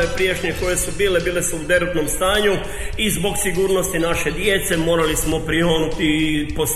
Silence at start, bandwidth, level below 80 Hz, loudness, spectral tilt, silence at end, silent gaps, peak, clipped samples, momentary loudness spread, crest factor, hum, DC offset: 0 s; 15 kHz; -30 dBFS; -19 LUFS; -3.5 dB/octave; 0 s; none; -4 dBFS; under 0.1%; 3 LU; 16 dB; none; under 0.1%